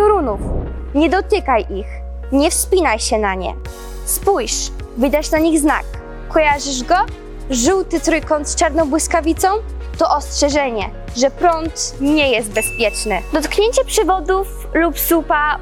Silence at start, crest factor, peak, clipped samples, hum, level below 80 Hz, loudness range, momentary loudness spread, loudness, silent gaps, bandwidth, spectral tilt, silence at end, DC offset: 0 s; 14 dB; -4 dBFS; under 0.1%; none; -28 dBFS; 1 LU; 10 LU; -17 LUFS; none; 19 kHz; -3.5 dB/octave; 0 s; under 0.1%